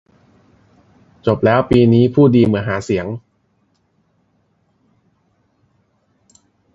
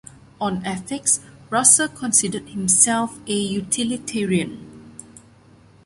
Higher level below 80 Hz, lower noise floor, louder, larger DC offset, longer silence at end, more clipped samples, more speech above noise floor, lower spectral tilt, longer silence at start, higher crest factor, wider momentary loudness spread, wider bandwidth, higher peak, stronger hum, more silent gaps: first, -44 dBFS vs -56 dBFS; first, -62 dBFS vs -50 dBFS; first, -14 LUFS vs -19 LUFS; neither; first, 3.55 s vs 0.85 s; neither; first, 49 dB vs 30 dB; first, -8.5 dB/octave vs -2.5 dB/octave; first, 1.25 s vs 0.4 s; about the same, 18 dB vs 22 dB; second, 11 LU vs 14 LU; second, 7.8 kHz vs 12 kHz; about the same, 0 dBFS vs 0 dBFS; neither; neither